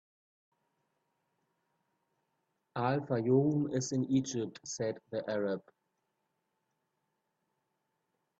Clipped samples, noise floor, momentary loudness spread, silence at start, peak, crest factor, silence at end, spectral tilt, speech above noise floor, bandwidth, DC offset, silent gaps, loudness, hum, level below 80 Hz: under 0.1%; -83 dBFS; 11 LU; 2.75 s; -16 dBFS; 20 dB; 2.8 s; -6 dB/octave; 50 dB; 8.2 kHz; under 0.1%; none; -34 LUFS; none; -76 dBFS